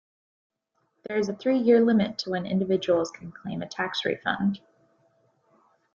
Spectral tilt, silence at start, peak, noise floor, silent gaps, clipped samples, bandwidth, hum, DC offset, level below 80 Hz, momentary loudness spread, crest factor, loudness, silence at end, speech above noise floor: -6 dB/octave; 1.1 s; -8 dBFS; -74 dBFS; none; under 0.1%; 7.4 kHz; none; under 0.1%; -66 dBFS; 15 LU; 18 dB; -26 LUFS; 1.35 s; 49 dB